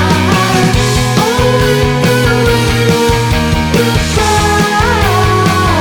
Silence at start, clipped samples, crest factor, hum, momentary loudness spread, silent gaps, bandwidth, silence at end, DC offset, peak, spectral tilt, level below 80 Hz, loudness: 0 s; under 0.1%; 10 dB; none; 1 LU; none; 19.5 kHz; 0 s; under 0.1%; 0 dBFS; -5 dB/octave; -22 dBFS; -10 LUFS